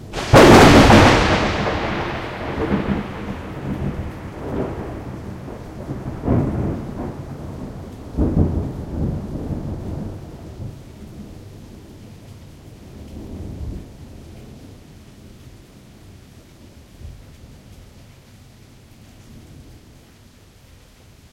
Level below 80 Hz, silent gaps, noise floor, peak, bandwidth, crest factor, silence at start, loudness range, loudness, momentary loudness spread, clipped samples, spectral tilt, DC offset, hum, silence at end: -34 dBFS; none; -47 dBFS; 0 dBFS; 16.5 kHz; 20 dB; 0 s; 26 LU; -17 LUFS; 29 LU; under 0.1%; -5.5 dB/octave; under 0.1%; none; 1.55 s